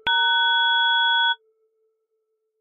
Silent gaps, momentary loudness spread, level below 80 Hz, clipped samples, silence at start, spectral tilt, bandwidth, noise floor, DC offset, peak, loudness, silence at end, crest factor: none; 4 LU; -68 dBFS; under 0.1%; 0.05 s; 6.5 dB/octave; 4 kHz; -75 dBFS; under 0.1%; -12 dBFS; -18 LUFS; 1.25 s; 10 dB